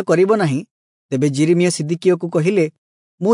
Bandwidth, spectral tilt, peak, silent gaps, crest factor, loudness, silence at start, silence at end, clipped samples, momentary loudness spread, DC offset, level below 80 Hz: 11 kHz; -6.5 dB/octave; -4 dBFS; 0.71-1.09 s, 2.78-3.18 s; 14 dB; -17 LUFS; 0 s; 0 s; under 0.1%; 8 LU; under 0.1%; -68 dBFS